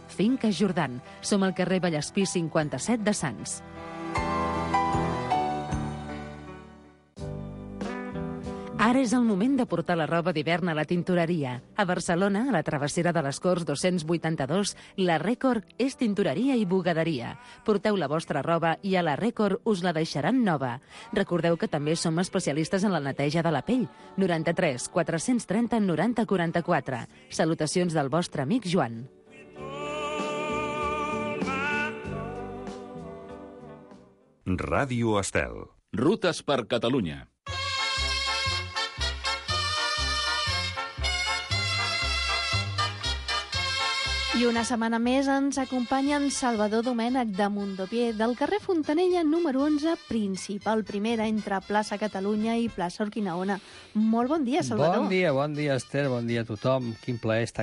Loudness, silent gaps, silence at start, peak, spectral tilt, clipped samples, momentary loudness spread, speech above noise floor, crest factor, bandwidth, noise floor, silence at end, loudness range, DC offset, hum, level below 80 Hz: -27 LUFS; none; 0 s; -12 dBFS; -5 dB/octave; under 0.1%; 10 LU; 30 dB; 16 dB; 11.5 kHz; -57 dBFS; 0 s; 4 LU; under 0.1%; none; -46 dBFS